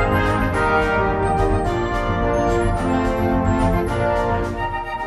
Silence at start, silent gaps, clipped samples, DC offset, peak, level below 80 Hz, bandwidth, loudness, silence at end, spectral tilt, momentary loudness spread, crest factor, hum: 0 s; none; under 0.1%; under 0.1%; -6 dBFS; -28 dBFS; 12 kHz; -20 LUFS; 0 s; -7 dB/octave; 4 LU; 12 dB; none